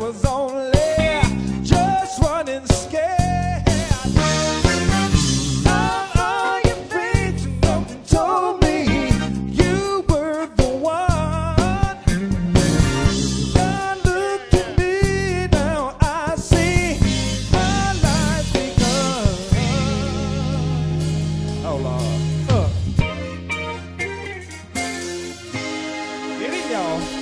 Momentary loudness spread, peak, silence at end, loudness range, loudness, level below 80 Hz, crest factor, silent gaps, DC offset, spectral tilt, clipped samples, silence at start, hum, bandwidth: 8 LU; 0 dBFS; 0 s; 5 LU; -20 LUFS; -26 dBFS; 18 dB; none; under 0.1%; -5.5 dB/octave; under 0.1%; 0 s; none; 11 kHz